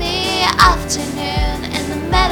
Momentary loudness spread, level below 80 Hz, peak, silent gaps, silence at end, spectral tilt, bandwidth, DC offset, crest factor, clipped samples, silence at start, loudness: 10 LU; -24 dBFS; 0 dBFS; none; 0 s; -3.5 dB/octave; 19.5 kHz; under 0.1%; 16 dB; under 0.1%; 0 s; -16 LUFS